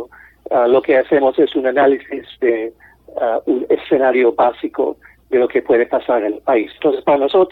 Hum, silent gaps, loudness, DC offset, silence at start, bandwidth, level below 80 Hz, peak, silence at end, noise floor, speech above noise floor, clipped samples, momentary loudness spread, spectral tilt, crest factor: none; none; -16 LUFS; under 0.1%; 0 s; 4.4 kHz; -54 dBFS; -4 dBFS; 0 s; -36 dBFS; 20 dB; under 0.1%; 8 LU; -8 dB/octave; 12 dB